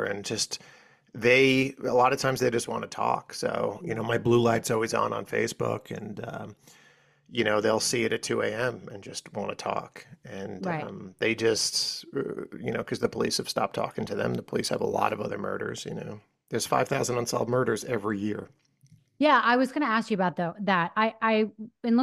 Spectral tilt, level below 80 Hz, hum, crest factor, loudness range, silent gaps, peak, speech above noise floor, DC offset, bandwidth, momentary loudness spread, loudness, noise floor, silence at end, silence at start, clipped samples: -4 dB/octave; -64 dBFS; none; 20 dB; 5 LU; none; -8 dBFS; 33 dB; under 0.1%; 15 kHz; 14 LU; -27 LUFS; -60 dBFS; 0 s; 0 s; under 0.1%